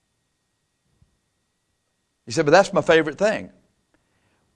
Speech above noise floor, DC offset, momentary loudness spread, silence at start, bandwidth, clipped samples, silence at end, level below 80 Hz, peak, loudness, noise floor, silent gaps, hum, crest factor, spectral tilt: 54 dB; under 0.1%; 10 LU; 2.25 s; 10.5 kHz; under 0.1%; 1.1 s; -60 dBFS; -2 dBFS; -19 LUFS; -73 dBFS; none; none; 22 dB; -4.5 dB/octave